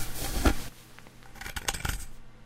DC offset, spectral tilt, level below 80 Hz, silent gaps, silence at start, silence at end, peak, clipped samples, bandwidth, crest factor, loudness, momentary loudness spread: under 0.1%; -3.5 dB/octave; -36 dBFS; none; 0 s; 0 s; -10 dBFS; under 0.1%; 16 kHz; 22 dB; -32 LUFS; 22 LU